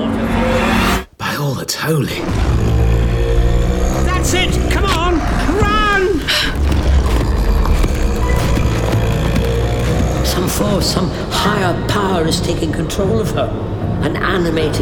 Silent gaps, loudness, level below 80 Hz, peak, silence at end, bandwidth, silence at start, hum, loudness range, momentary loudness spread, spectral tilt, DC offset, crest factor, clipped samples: none; -16 LUFS; -18 dBFS; -2 dBFS; 0 s; 18.5 kHz; 0 s; none; 2 LU; 4 LU; -5 dB/octave; under 0.1%; 12 dB; under 0.1%